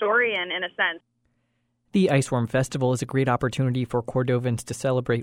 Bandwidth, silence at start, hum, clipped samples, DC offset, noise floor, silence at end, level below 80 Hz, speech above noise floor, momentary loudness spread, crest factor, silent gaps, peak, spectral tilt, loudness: 14.5 kHz; 0 s; none; under 0.1%; under 0.1%; -72 dBFS; 0 s; -56 dBFS; 48 dB; 6 LU; 18 dB; none; -6 dBFS; -6 dB/octave; -24 LUFS